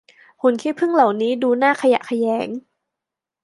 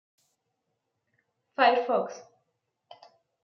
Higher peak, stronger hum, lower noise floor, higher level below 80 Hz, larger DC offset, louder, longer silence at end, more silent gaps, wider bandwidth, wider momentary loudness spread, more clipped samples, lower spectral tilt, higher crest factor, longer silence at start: first, -2 dBFS vs -8 dBFS; neither; first, -85 dBFS vs -81 dBFS; first, -74 dBFS vs -90 dBFS; neither; first, -19 LUFS vs -26 LUFS; second, 0.85 s vs 1.2 s; neither; first, 11.5 kHz vs 6.8 kHz; second, 7 LU vs 19 LU; neither; first, -5 dB/octave vs -3.5 dB/octave; second, 18 dB vs 24 dB; second, 0.45 s vs 1.6 s